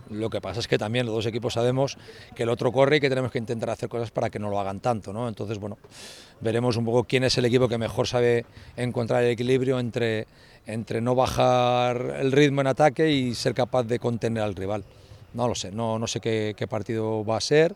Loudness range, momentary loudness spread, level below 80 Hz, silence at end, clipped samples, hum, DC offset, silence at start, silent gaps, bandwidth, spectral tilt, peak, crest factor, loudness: 6 LU; 11 LU; -54 dBFS; 0 s; under 0.1%; none; under 0.1%; 0.1 s; none; 14.5 kHz; -5.5 dB/octave; -6 dBFS; 20 dB; -25 LUFS